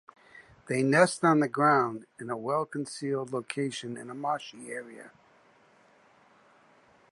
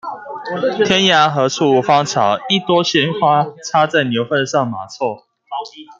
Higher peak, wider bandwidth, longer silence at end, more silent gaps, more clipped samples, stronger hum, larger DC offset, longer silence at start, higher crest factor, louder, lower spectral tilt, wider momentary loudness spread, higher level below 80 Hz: second, -8 dBFS vs -2 dBFS; first, 11.5 kHz vs 7.8 kHz; first, 2.05 s vs 0.05 s; neither; neither; neither; neither; first, 0.35 s vs 0.05 s; first, 22 dB vs 14 dB; second, -29 LUFS vs -15 LUFS; first, -5.5 dB/octave vs -4 dB/octave; about the same, 17 LU vs 15 LU; second, -76 dBFS vs -58 dBFS